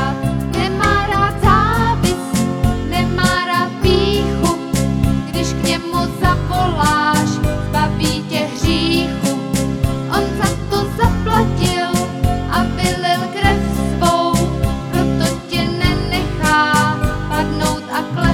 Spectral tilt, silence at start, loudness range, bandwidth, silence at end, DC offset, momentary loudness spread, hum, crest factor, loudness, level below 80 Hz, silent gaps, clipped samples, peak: -5 dB/octave; 0 s; 2 LU; 17 kHz; 0 s; under 0.1%; 5 LU; none; 16 dB; -16 LUFS; -26 dBFS; none; under 0.1%; 0 dBFS